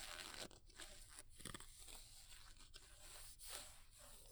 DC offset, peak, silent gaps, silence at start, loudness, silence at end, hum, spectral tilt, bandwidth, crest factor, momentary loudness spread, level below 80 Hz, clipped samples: under 0.1%; -28 dBFS; none; 0 s; -57 LUFS; 0 s; none; -1.5 dB/octave; over 20 kHz; 28 dB; 9 LU; -64 dBFS; under 0.1%